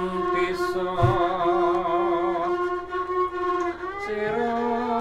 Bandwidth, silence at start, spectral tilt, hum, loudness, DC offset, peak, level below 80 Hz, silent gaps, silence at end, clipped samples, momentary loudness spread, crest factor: 10.5 kHz; 0 s; -7 dB/octave; none; -25 LUFS; under 0.1%; -6 dBFS; -48 dBFS; none; 0 s; under 0.1%; 6 LU; 18 dB